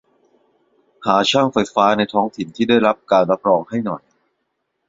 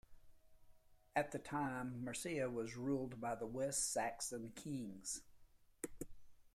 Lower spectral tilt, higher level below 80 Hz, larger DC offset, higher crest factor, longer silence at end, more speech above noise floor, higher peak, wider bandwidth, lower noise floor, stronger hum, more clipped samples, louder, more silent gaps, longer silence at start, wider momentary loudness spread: about the same, -5 dB/octave vs -4 dB/octave; first, -60 dBFS vs -68 dBFS; neither; about the same, 18 dB vs 22 dB; first, 0.9 s vs 0.05 s; first, 56 dB vs 23 dB; first, 0 dBFS vs -22 dBFS; second, 7.8 kHz vs 16 kHz; first, -72 dBFS vs -66 dBFS; neither; neither; first, -17 LUFS vs -44 LUFS; neither; first, 1 s vs 0.1 s; about the same, 9 LU vs 11 LU